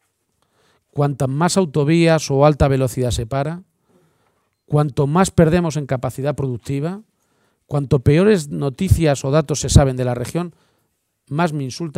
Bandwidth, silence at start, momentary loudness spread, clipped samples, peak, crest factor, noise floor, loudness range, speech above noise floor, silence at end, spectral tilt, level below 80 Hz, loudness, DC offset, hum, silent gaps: 15.5 kHz; 0.95 s; 11 LU; under 0.1%; 0 dBFS; 18 dB; -69 dBFS; 3 LU; 52 dB; 0.05 s; -6.5 dB/octave; -34 dBFS; -18 LUFS; under 0.1%; none; none